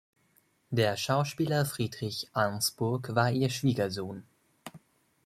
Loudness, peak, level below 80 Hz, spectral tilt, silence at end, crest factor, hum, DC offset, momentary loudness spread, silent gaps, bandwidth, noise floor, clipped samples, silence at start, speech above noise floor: -30 LUFS; -10 dBFS; -66 dBFS; -5 dB/octave; 0.5 s; 22 dB; none; under 0.1%; 18 LU; none; 15.5 kHz; -69 dBFS; under 0.1%; 0.7 s; 39 dB